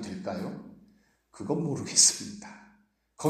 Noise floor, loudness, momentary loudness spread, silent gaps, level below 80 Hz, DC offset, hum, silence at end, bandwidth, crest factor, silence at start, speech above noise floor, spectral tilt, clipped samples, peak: -65 dBFS; -25 LUFS; 25 LU; none; -68 dBFS; under 0.1%; none; 0 s; 15.5 kHz; 24 dB; 0 s; 36 dB; -2.5 dB/octave; under 0.1%; -8 dBFS